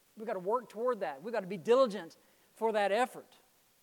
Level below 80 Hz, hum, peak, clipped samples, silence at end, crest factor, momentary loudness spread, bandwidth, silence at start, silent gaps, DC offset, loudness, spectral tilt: -88 dBFS; none; -16 dBFS; under 0.1%; 0.6 s; 18 dB; 13 LU; 18.5 kHz; 0.15 s; none; under 0.1%; -33 LUFS; -5 dB/octave